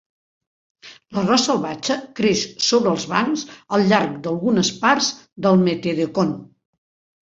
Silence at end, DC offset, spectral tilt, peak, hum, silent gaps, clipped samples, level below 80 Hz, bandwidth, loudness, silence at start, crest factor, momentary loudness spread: 0.75 s; under 0.1%; -4.5 dB/octave; -2 dBFS; none; 5.32-5.36 s; under 0.1%; -60 dBFS; 7.8 kHz; -19 LUFS; 0.85 s; 20 dB; 7 LU